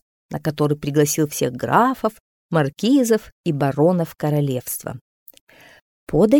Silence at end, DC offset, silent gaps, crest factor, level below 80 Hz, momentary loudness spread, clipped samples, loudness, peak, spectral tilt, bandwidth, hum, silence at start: 0 s; under 0.1%; 2.20-2.49 s, 3.32-3.44 s, 5.01-5.26 s, 5.41-5.47 s, 5.82-6.07 s; 18 dB; -50 dBFS; 10 LU; under 0.1%; -20 LUFS; -2 dBFS; -6 dB/octave; 19.5 kHz; none; 0.3 s